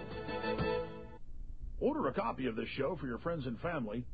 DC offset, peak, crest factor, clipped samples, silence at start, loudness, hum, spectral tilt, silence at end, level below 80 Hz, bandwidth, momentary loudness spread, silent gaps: 0.2%; -22 dBFS; 16 dB; under 0.1%; 0 s; -37 LUFS; none; -9 dB/octave; 0 s; -50 dBFS; 5 kHz; 16 LU; none